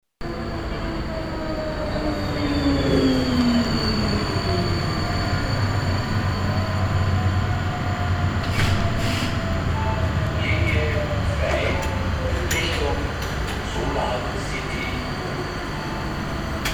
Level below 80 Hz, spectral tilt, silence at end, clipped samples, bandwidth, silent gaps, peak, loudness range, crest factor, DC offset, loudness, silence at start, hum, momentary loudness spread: -30 dBFS; -6 dB/octave; 0 s; under 0.1%; 18.5 kHz; none; -8 dBFS; 4 LU; 16 dB; under 0.1%; -23 LUFS; 0.2 s; none; 8 LU